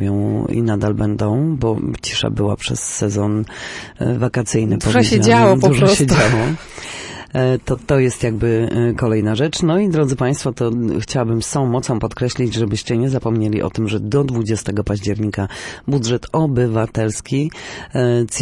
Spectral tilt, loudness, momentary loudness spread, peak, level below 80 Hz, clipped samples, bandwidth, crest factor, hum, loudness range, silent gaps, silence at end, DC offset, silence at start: -5.5 dB/octave; -17 LUFS; 9 LU; -2 dBFS; -38 dBFS; under 0.1%; 11.5 kHz; 16 dB; none; 5 LU; none; 0 s; under 0.1%; 0 s